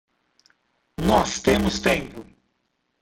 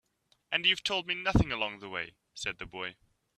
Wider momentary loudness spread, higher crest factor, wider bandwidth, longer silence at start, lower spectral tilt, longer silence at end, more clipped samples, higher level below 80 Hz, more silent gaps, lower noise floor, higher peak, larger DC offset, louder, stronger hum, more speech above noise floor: first, 20 LU vs 13 LU; about the same, 20 dB vs 22 dB; first, 16.5 kHz vs 12.5 kHz; first, 1 s vs 0.5 s; about the same, -4.5 dB/octave vs -4.5 dB/octave; first, 0.8 s vs 0.45 s; neither; first, -40 dBFS vs -46 dBFS; neither; about the same, -73 dBFS vs -70 dBFS; first, -6 dBFS vs -12 dBFS; neither; first, -21 LUFS vs -31 LUFS; neither; first, 51 dB vs 38 dB